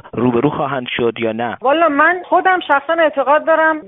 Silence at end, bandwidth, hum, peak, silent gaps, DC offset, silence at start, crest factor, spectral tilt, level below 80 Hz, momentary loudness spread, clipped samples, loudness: 0 s; 4 kHz; none; 0 dBFS; none; under 0.1%; 0.05 s; 14 dB; -3 dB/octave; -54 dBFS; 7 LU; under 0.1%; -15 LUFS